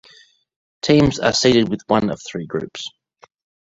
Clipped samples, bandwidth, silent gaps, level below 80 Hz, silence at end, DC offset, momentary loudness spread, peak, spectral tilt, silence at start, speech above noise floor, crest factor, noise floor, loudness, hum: under 0.1%; 8 kHz; none; -46 dBFS; 0.8 s; under 0.1%; 15 LU; -2 dBFS; -5 dB/octave; 0.85 s; 34 dB; 18 dB; -51 dBFS; -18 LUFS; none